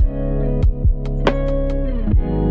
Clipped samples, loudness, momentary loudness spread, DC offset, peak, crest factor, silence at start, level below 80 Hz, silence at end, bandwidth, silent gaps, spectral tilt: under 0.1%; -20 LUFS; 3 LU; under 0.1%; 0 dBFS; 16 dB; 0 s; -18 dBFS; 0 s; 5.4 kHz; none; -9 dB/octave